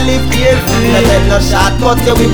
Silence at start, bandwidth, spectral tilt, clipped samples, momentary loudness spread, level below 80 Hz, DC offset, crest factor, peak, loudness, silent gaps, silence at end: 0 s; over 20 kHz; -5 dB/octave; under 0.1%; 2 LU; -16 dBFS; under 0.1%; 10 dB; 0 dBFS; -10 LUFS; none; 0 s